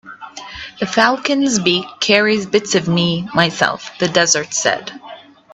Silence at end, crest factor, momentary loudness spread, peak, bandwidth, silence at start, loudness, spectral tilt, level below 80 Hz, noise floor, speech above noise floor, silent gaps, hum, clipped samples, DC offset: 0.35 s; 18 dB; 17 LU; 0 dBFS; 8.6 kHz; 0.05 s; -15 LUFS; -3 dB/octave; -54 dBFS; -38 dBFS; 22 dB; none; none; under 0.1%; under 0.1%